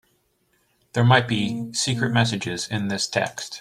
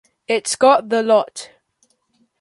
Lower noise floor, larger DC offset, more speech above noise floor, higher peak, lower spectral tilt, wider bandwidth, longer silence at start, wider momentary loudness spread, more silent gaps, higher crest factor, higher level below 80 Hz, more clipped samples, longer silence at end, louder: about the same, -67 dBFS vs -64 dBFS; neither; about the same, 45 dB vs 48 dB; about the same, -2 dBFS vs -2 dBFS; first, -4.5 dB/octave vs -2.5 dB/octave; first, 13 kHz vs 11.5 kHz; first, 0.95 s vs 0.3 s; second, 9 LU vs 13 LU; neither; about the same, 20 dB vs 18 dB; first, -58 dBFS vs -66 dBFS; neither; second, 0 s vs 0.95 s; second, -22 LUFS vs -16 LUFS